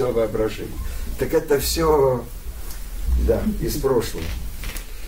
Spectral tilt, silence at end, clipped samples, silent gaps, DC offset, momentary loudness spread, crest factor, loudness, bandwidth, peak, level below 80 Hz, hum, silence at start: -5 dB/octave; 0 s; under 0.1%; none; under 0.1%; 15 LU; 16 dB; -23 LUFS; 16.5 kHz; -6 dBFS; -28 dBFS; none; 0 s